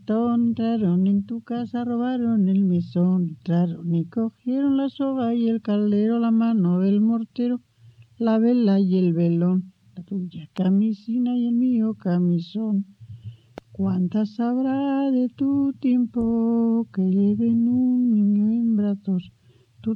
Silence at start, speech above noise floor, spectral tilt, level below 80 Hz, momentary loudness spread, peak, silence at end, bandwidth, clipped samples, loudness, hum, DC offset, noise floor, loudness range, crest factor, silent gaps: 0.1 s; 30 dB; -10.5 dB/octave; -62 dBFS; 8 LU; -10 dBFS; 0 s; 5.2 kHz; under 0.1%; -22 LUFS; none; under 0.1%; -51 dBFS; 3 LU; 10 dB; none